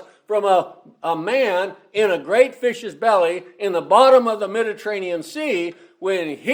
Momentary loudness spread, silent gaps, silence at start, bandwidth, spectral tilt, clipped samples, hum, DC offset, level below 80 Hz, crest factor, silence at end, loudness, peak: 12 LU; none; 0 s; 16 kHz; -4 dB/octave; under 0.1%; none; under 0.1%; -76 dBFS; 18 dB; 0 s; -19 LUFS; 0 dBFS